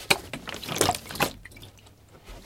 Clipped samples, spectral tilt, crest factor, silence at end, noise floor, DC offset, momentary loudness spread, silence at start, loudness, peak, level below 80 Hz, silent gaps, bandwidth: under 0.1%; -2.5 dB/octave; 30 dB; 0 s; -52 dBFS; under 0.1%; 22 LU; 0 s; -27 LUFS; 0 dBFS; -52 dBFS; none; 17 kHz